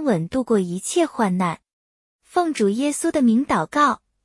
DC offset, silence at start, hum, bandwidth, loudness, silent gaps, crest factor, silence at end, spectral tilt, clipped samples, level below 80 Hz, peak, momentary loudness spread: under 0.1%; 0 s; none; 12 kHz; -21 LUFS; 1.73-2.19 s; 16 dB; 0.3 s; -5.5 dB/octave; under 0.1%; -56 dBFS; -6 dBFS; 5 LU